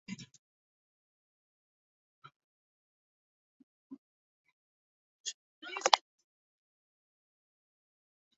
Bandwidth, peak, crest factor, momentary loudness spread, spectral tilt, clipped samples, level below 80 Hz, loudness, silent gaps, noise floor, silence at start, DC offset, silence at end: 7.6 kHz; -2 dBFS; 40 dB; 21 LU; 0.5 dB/octave; under 0.1%; -90 dBFS; -32 LUFS; 0.39-2.22 s, 2.36-3.90 s, 3.98-4.44 s, 4.52-5.24 s, 5.34-5.62 s; under -90 dBFS; 0.1 s; under 0.1%; 2.4 s